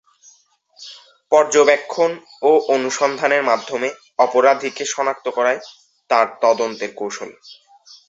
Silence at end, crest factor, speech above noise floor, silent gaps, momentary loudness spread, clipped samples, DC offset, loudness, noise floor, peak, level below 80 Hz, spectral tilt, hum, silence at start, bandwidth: 0.55 s; 18 dB; 38 dB; none; 13 LU; under 0.1%; under 0.1%; -18 LUFS; -55 dBFS; -2 dBFS; -70 dBFS; -2.5 dB/octave; none; 0.8 s; 8 kHz